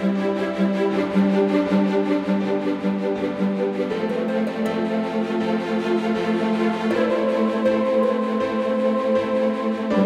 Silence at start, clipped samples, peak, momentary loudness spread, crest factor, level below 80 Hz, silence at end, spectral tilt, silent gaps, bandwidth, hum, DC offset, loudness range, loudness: 0 s; under 0.1%; -8 dBFS; 4 LU; 14 dB; -60 dBFS; 0 s; -7.5 dB/octave; none; 10 kHz; none; under 0.1%; 2 LU; -22 LUFS